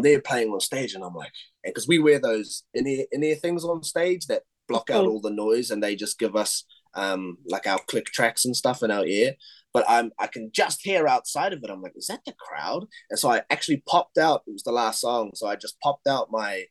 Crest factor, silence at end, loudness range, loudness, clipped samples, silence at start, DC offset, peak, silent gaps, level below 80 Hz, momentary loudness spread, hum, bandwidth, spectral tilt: 20 dB; 0.05 s; 2 LU; -25 LUFS; under 0.1%; 0 s; under 0.1%; -4 dBFS; none; -72 dBFS; 11 LU; none; 12.5 kHz; -3.5 dB/octave